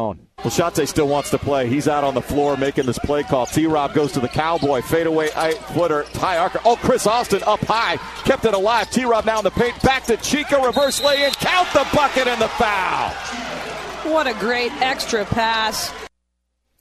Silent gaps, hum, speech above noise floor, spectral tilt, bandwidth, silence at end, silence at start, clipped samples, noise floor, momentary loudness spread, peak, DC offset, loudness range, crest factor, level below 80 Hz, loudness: none; none; 54 dB; -4 dB/octave; 14 kHz; 0.75 s; 0 s; under 0.1%; -72 dBFS; 6 LU; 0 dBFS; under 0.1%; 3 LU; 18 dB; -42 dBFS; -19 LUFS